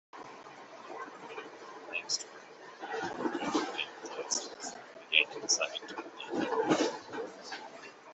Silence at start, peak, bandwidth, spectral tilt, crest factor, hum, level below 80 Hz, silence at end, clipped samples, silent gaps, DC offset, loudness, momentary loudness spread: 0.15 s; -8 dBFS; 8.2 kHz; -1.5 dB/octave; 30 dB; none; -80 dBFS; 0 s; under 0.1%; none; under 0.1%; -34 LUFS; 20 LU